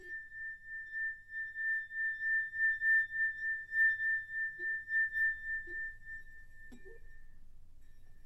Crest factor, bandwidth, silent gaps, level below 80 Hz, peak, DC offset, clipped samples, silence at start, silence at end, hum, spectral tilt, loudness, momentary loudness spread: 14 dB; 13 kHz; none; -58 dBFS; -22 dBFS; under 0.1%; under 0.1%; 0 s; 0 s; none; -3.5 dB/octave; -34 LUFS; 15 LU